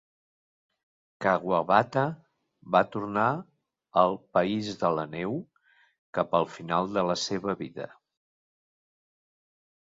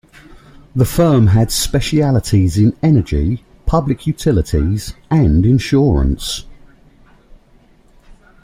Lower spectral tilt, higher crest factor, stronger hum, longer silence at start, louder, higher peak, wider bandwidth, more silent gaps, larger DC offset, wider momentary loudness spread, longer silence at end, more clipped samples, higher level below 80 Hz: about the same, -5.5 dB/octave vs -6.5 dB/octave; first, 24 dB vs 14 dB; neither; first, 1.2 s vs 0.75 s; second, -28 LUFS vs -15 LUFS; second, -6 dBFS vs -2 dBFS; second, 7.8 kHz vs 16 kHz; first, 5.98-6.13 s vs none; neither; about the same, 11 LU vs 9 LU; first, 1.95 s vs 0.3 s; neither; second, -66 dBFS vs -26 dBFS